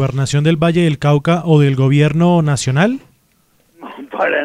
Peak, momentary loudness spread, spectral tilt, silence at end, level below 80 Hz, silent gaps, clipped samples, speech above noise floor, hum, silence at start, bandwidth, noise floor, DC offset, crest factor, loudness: 0 dBFS; 12 LU; -6.5 dB/octave; 0 s; -48 dBFS; none; under 0.1%; 44 dB; none; 0 s; 11 kHz; -57 dBFS; 0.3%; 14 dB; -14 LUFS